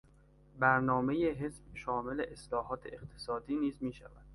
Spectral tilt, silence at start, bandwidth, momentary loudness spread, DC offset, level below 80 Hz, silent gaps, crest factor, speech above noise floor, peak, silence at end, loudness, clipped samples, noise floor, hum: -7 dB/octave; 0.55 s; 11.5 kHz; 14 LU; under 0.1%; -58 dBFS; none; 24 dB; 27 dB; -12 dBFS; 0 s; -35 LUFS; under 0.1%; -62 dBFS; none